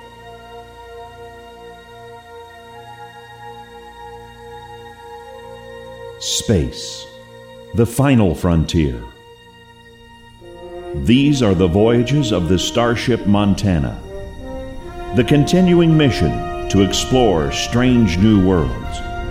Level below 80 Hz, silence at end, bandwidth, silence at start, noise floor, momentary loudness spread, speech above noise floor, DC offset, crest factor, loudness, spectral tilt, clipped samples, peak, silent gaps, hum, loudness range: -32 dBFS; 0 s; 16 kHz; 0 s; -43 dBFS; 24 LU; 29 dB; under 0.1%; 18 dB; -16 LUFS; -6 dB/octave; under 0.1%; 0 dBFS; none; none; 22 LU